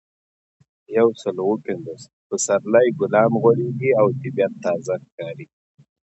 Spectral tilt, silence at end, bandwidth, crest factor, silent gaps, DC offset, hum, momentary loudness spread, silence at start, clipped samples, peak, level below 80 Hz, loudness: -6 dB/octave; 0.6 s; 8.2 kHz; 18 dB; 2.13-2.30 s, 5.12-5.18 s; under 0.1%; none; 16 LU; 0.9 s; under 0.1%; -4 dBFS; -66 dBFS; -20 LUFS